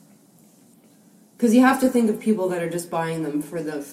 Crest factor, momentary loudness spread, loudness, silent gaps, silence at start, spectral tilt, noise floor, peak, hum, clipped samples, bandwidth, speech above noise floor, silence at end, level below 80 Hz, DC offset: 20 dB; 11 LU; -21 LUFS; none; 1.4 s; -5.5 dB/octave; -54 dBFS; -4 dBFS; none; under 0.1%; 15.5 kHz; 33 dB; 0 s; -66 dBFS; under 0.1%